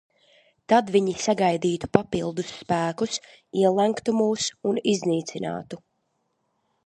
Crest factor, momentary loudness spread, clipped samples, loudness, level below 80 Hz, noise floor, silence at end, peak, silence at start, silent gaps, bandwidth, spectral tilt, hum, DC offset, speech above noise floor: 24 dB; 11 LU; under 0.1%; -24 LUFS; -58 dBFS; -74 dBFS; 1.1 s; 0 dBFS; 0.7 s; none; 11.5 kHz; -5 dB/octave; none; under 0.1%; 50 dB